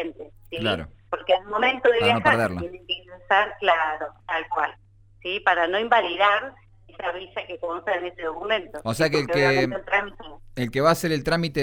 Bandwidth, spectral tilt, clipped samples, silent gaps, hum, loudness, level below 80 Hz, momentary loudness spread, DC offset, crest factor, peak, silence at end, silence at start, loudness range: 16.5 kHz; -5 dB/octave; under 0.1%; none; none; -23 LUFS; -50 dBFS; 13 LU; under 0.1%; 20 dB; -4 dBFS; 0 s; 0 s; 3 LU